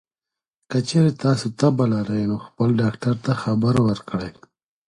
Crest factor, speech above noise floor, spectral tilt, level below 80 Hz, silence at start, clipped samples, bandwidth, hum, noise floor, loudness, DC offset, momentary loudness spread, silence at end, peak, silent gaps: 16 dB; 68 dB; -7 dB/octave; -52 dBFS; 0.7 s; under 0.1%; 11.5 kHz; none; -89 dBFS; -21 LUFS; under 0.1%; 8 LU; 0.55 s; -4 dBFS; none